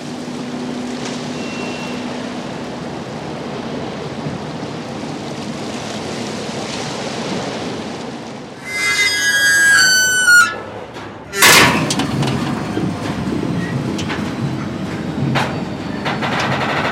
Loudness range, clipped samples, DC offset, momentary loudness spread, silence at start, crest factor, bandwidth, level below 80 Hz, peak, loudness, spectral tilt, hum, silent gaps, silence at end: 14 LU; under 0.1%; under 0.1%; 17 LU; 0 s; 18 dB; 16.5 kHz; -46 dBFS; 0 dBFS; -17 LUFS; -3 dB/octave; none; none; 0 s